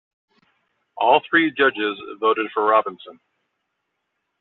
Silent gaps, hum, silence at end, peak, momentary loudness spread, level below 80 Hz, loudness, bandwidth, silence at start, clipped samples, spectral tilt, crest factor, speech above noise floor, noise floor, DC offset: none; none; 1.3 s; -4 dBFS; 9 LU; -68 dBFS; -19 LUFS; 4.3 kHz; 0.95 s; under 0.1%; -0.5 dB/octave; 20 dB; 57 dB; -76 dBFS; under 0.1%